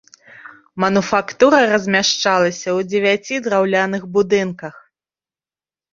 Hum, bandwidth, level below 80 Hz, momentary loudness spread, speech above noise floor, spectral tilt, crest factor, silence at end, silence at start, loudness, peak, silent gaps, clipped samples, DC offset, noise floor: none; 7.6 kHz; -60 dBFS; 8 LU; over 74 dB; -4 dB/octave; 16 dB; 1.15 s; 0.35 s; -16 LUFS; -2 dBFS; none; under 0.1%; under 0.1%; under -90 dBFS